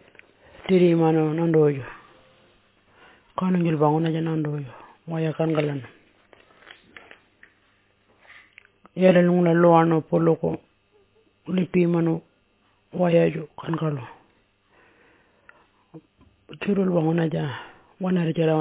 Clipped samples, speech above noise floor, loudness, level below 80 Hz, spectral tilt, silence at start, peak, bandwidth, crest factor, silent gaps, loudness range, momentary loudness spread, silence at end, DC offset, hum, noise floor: under 0.1%; 43 dB; -22 LUFS; -62 dBFS; -12 dB/octave; 0.65 s; -4 dBFS; 4 kHz; 20 dB; none; 10 LU; 17 LU; 0 s; under 0.1%; none; -64 dBFS